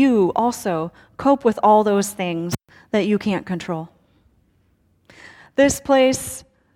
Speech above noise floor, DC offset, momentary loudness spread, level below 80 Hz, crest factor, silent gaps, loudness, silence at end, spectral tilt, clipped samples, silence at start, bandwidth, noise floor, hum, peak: 42 dB; under 0.1%; 14 LU; -52 dBFS; 16 dB; none; -19 LUFS; 0.35 s; -5 dB/octave; under 0.1%; 0 s; 18.5 kHz; -61 dBFS; none; -4 dBFS